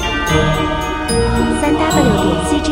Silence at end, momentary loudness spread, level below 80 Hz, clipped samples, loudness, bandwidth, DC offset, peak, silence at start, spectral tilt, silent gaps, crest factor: 0 s; 4 LU; -24 dBFS; under 0.1%; -15 LUFS; 16.5 kHz; under 0.1%; 0 dBFS; 0 s; -5 dB/octave; none; 14 dB